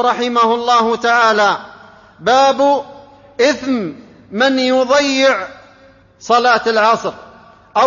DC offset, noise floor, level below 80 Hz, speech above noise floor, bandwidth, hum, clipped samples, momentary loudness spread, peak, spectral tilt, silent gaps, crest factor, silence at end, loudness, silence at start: under 0.1%; -46 dBFS; -56 dBFS; 33 dB; 7.4 kHz; none; under 0.1%; 14 LU; 0 dBFS; -3 dB/octave; none; 14 dB; 0 s; -14 LUFS; 0 s